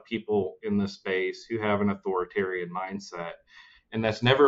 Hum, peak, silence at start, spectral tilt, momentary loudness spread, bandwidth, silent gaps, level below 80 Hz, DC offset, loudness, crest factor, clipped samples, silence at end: none; -8 dBFS; 0.1 s; -6.5 dB/octave; 10 LU; 7.8 kHz; none; -60 dBFS; under 0.1%; -29 LUFS; 20 dB; under 0.1%; 0 s